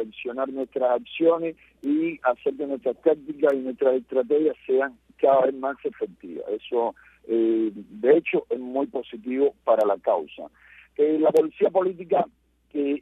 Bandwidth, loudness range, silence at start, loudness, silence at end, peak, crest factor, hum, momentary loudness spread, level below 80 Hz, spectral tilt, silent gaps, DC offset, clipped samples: 8 kHz; 2 LU; 0 s; -24 LUFS; 0 s; -6 dBFS; 18 dB; none; 12 LU; -68 dBFS; -7 dB/octave; none; under 0.1%; under 0.1%